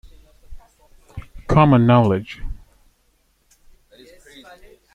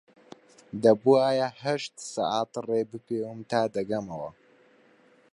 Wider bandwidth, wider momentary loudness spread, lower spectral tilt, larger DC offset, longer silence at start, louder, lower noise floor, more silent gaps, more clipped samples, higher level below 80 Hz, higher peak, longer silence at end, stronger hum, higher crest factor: second, 9 kHz vs 11.5 kHz; first, 27 LU vs 14 LU; first, -9 dB/octave vs -5.5 dB/octave; neither; second, 0.5 s vs 0.75 s; first, -16 LUFS vs -27 LUFS; about the same, -62 dBFS vs -60 dBFS; neither; neither; first, -38 dBFS vs -70 dBFS; first, -2 dBFS vs -8 dBFS; first, 2.4 s vs 1 s; neither; about the same, 20 dB vs 20 dB